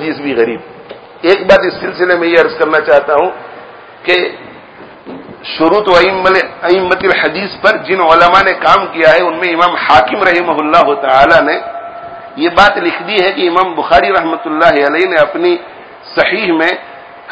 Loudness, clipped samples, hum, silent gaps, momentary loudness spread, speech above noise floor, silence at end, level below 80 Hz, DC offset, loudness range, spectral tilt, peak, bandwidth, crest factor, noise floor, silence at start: -10 LUFS; 1%; none; none; 13 LU; 24 dB; 0 s; -42 dBFS; under 0.1%; 4 LU; -5 dB/octave; 0 dBFS; 8 kHz; 10 dB; -34 dBFS; 0 s